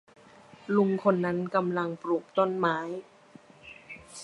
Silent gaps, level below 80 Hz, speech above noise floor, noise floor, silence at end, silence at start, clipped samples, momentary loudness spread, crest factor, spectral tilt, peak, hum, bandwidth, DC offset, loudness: none; -70 dBFS; 27 dB; -54 dBFS; 0 s; 0.7 s; under 0.1%; 20 LU; 20 dB; -7 dB/octave; -10 dBFS; none; 11.5 kHz; under 0.1%; -28 LUFS